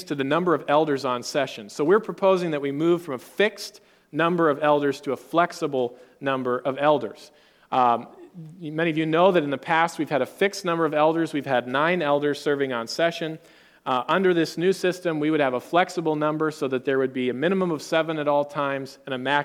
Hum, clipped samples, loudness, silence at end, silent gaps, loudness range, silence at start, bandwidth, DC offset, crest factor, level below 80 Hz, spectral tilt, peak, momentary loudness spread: none; under 0.1%; -24 LUFS; 0 s; none; 2 LU; 0 s; 17 kHz; under 0.1%; 20 dB; -74 dBFS; -5.5 dB/octave; -4 dBFS; 9 LU